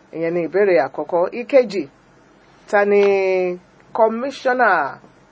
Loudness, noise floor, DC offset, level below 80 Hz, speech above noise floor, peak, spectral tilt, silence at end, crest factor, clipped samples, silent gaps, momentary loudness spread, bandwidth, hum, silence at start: -18 LUFS; -51 dBFS; under 0.1%; -66 dBFS; 33 dB; -2 dBFS; -6 dB/octave; 0.35 s; 18 dB; under 0.1%; none; 11 LU; 8 kHz; none; 0.15 s